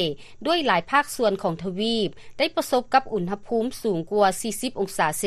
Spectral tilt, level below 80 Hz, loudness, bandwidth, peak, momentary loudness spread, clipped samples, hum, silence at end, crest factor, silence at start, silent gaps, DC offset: -4 dB/octave; -54 dBFS; -24 LUFS; 13.5 kHz; -6 dBFS; 7 LU; under 0.1%; none; 0 s; 18 dB; 0 s; none; under 0.1%